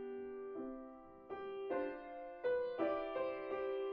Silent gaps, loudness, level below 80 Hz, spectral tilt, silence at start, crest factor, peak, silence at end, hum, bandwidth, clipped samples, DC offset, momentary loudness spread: none; -43 LUFS; -72 dBFS; -3 dB/octave; 0 s; 16 dB; -26 dBFS; 0 s; none; 5.2 kHz; under 0.1%; under 0.1%; 12 LU